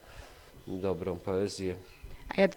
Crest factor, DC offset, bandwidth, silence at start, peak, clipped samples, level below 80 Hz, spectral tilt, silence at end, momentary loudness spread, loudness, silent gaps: 22 dB; under 0.1%; 19.5 kHz; 0.05 s; -12 dBFS; under 0.1%; -54 dBFS; -6 dB/octave; 0 s; 19 LU; -34 LUFS; none